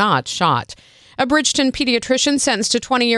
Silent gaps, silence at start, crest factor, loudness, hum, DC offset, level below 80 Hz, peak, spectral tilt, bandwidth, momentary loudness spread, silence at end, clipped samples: none; 0 s; 16 dB; -17 LUFS; none; under 0.1%; -48 dBFS; -2 dBFS; -3 dB/octave; 12.5 kHz; 7 LU; 0 s; under 0.1%